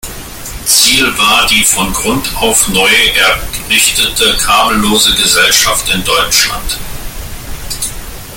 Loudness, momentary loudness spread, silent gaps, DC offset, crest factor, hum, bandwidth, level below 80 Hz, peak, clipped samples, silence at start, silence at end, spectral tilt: -8 LUFS; 18 LU; none; under 0.1%; 12 dB; none; over 20 kHz; -28 dBFS; 0 dBFS; 0.1%; 0.05 s; 0 s; -1 dB/octave